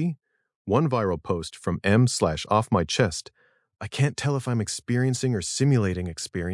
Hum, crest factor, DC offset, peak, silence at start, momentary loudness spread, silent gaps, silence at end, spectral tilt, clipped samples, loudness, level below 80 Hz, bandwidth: none; 20 dB; under 0.1%; -4 dBFS; 0 s; 9 LU; 0.55-0.65 s; 0 s; -5.5 dB/octave; under 0.1%; -25 LUFS; -54 dBFS; 12 kHz